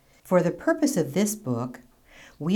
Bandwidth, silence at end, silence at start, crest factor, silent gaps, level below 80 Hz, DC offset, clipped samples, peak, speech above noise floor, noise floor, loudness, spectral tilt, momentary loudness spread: 19.5 kHz; 0 s; 0.25 s; 16 dB; none; -60 dBFS; under 0.1%; under 0.1%; -10 dBFS; 28 dB; -52 dBFS; -26 LUFS; -5.5 dB/octave; 9 LU